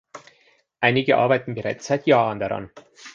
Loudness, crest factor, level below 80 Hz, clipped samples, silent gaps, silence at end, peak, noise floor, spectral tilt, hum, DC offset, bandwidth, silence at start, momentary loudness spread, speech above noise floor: -21 LUFS; 20 dB; -60 dBFS; under 0.1%; none; 0.05 s; -2 dBFS; -60 dBFS; -6 dB/octave; none; under 0.1%; 7.8 kHz; 0.15 s; 10 LU; 40 dB